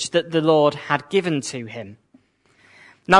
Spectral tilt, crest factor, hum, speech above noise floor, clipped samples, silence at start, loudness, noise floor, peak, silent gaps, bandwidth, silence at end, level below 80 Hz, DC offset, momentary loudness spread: -4.5 dB/octave; 20 dB; none; 38 dB; under 0.1%; 0 s; -21 LUFS; -59 dBFS; 0 dBFS; none; 11 kHz; 0 s; -62 dBFS; under 0.1%; 19 LU